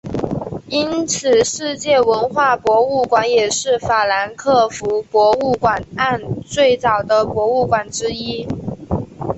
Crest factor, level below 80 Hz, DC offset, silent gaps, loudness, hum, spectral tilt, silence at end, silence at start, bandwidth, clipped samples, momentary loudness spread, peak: 14 dB; -44 dBFS; under 0.1%; none; -17 LUFS; none; -4 dB/octave; 0 s; 0.05 s; 8.4 kHz; under 0.1%; 10 LU; -2 dBFS